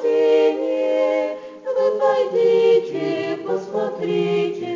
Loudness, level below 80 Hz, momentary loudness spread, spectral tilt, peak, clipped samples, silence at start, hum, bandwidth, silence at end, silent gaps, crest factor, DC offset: -19 LUFS; -72 dBFS; 9 LU; -6.5 dB/octave; -6 dBFS; under 0.1%; 0 s; none; 7.6 kHz; 0 s; none; 12 dB; under 0.1%